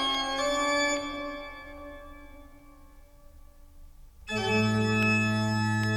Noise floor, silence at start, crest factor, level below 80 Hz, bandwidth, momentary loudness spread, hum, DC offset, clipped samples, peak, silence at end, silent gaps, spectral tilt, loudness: -52 dBFS; 0 s; 16 dB; -50 dBFS; 14.5 kHz; 20 LU; none; under 0.1%; under 0.1%; -14 dBFS; 0 s; none; -4.5 dB/octave; -27 LUFS